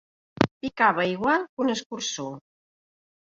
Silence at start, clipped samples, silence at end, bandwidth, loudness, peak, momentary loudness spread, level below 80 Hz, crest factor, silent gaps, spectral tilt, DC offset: 0.4 s; under 0.1%; 0.95 s; 7.6 kHz; -25 LUFS; -2 dBFS; 12 LU; -62 dBFS; 26 dB; 0.51-0.61 s, 1.49-1.57 s, 1.86-1.90 s; -4 dB/octave; under 0.1%